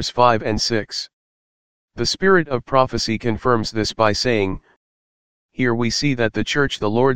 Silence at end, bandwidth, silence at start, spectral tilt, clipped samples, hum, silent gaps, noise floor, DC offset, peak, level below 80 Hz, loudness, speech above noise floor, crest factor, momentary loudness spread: 0 s; 16 kHz; 0 s; -4.5 dB/octave; under 0.1%; none; 1.13-1.88 s, 4.76-5.49 s; under -90 dBFS; 2%; 0 dBFS; -44 dBFS; -19 LUFS; over 71 dB; 20 dB; 8 LU